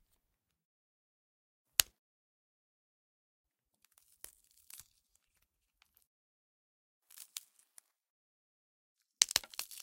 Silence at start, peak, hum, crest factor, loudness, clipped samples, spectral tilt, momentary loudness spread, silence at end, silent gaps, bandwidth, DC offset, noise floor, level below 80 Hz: 1.8 s; 0 dBFS; none; 44 dB; -32 LUFS; under 0.1%; 2.5 dB/octave; 25 LU; 0.05 s; 1.99-3.44 s, 6.07-7.01 s, 8.10-8.96 s; 16.5 kHz; under 0.1%; -84 dBFS; -72 dBFS